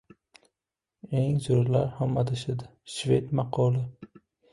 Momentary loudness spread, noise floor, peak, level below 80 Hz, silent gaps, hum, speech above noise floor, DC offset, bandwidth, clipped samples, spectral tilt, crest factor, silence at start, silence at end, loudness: 10 LU; -89 dBFS; -10 dBFS; -56 dBFS; none; none; 62 dB; under 0.1%; 11.5 kHz; under 0.1%; -7.5 dB/octave; 18 dB; 1.05 s; 0.45 s; -28 LUFS